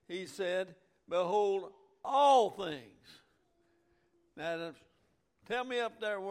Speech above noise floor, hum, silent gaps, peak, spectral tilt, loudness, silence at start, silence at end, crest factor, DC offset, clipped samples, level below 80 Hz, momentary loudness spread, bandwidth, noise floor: 42 dB; none; none; -16 dBFS; -4 dB/octave; -33 LUFS; 0.1 s; 0 s; 20 dB; under 0.1%; under 0.1%; -78 dBFS; 19 LU; 15 kHz; -75 dBFS